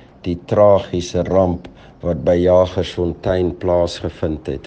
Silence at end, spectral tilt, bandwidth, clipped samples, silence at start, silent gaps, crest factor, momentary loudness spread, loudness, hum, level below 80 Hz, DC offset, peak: 0 s; -7 dB/octave; 9 kHz; under 0.1%; 0.25 s; none; 16 dB; 11 LU; -17 LUFS; none; -40 dBFS; under 0.1%; -2 dBFS